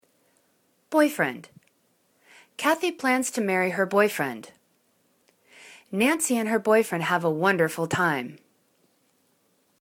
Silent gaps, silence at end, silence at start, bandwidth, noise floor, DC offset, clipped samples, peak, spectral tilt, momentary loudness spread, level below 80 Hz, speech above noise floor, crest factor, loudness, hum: none; 1.45 s; 0.9 s; 19 kHz; -68 dBFS; under 0.1%; under 0.1%; -6 dBFS; -4 dB/octave; 9 LU; -74 dBFS; 44 dB; 20 dB; -24 LUFS; none